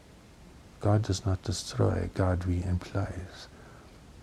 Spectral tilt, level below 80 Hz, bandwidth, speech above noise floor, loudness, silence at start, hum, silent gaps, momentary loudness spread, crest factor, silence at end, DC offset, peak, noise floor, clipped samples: -6.5 dB/octave; -46 dBFS; 12 kHz; 24 dB; -30 LUFS; 0.1 s; none; none; 19 LU; 20 dB; 0 s; under 0.1%; -12 dBFS; -53 dBFS; under 0.1%